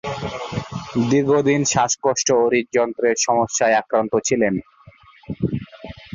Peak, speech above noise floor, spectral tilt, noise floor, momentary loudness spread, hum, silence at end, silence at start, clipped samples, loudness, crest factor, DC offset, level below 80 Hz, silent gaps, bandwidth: -4 dBFS; 30 dB; -4 dB/octave; -48 dBFS; 11 LU; none; 0.1 s; 0.05 s; under 0.1%; -19 LUFS; 16 dB; under 0.1%; -50 dBFS; none; 7.8 kHz